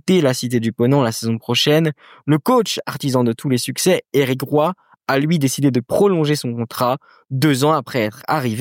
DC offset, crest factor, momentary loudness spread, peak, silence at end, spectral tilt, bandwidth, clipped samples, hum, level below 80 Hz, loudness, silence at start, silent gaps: under 0.1%; 16 dB; 7 LU; -2 dBFS; 0 s; -5.5 dB/octave; 17 kHz; under 0.1%; none; -62 dBFS; -18 LUFS; 0.05 s; none